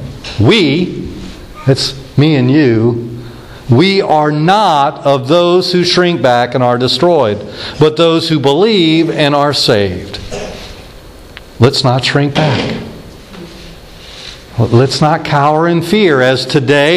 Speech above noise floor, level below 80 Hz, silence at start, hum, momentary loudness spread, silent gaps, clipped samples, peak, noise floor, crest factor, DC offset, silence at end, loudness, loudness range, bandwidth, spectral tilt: 23 dB; -38 dBFS; 0 s; none; 18 LU; none; 0.2%; 0 dBFS; -33 dBFS; 12 dB; under 0.1%; 0 s; -10 LUFS; 5 LU; 14 kHz; -6 dB/octave